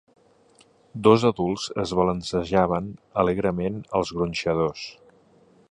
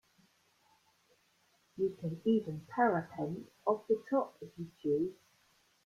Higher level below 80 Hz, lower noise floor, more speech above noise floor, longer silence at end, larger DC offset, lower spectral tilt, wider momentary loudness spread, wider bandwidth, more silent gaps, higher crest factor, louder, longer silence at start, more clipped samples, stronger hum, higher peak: first, -48 dBFS vs -76 dBFS; second, -58 dBFS vs -72 dBFS; about the same, 35 dB vs 38 dB; about the same, 0.8 s vs 0.7 s; neither; second, -6 dB/octave vs -8 dB/octave; about the same, 10 LU vs 11 LU; second, 10.5 kHz vs 13.5 kHz; neither; about the same, 22 dB vs 20 dB; first, -24 LUFS vs -35 LUFS; second, 0.95 s vs 1.75 s; neither; neither; first, -2 dBFS vs -18 dBFS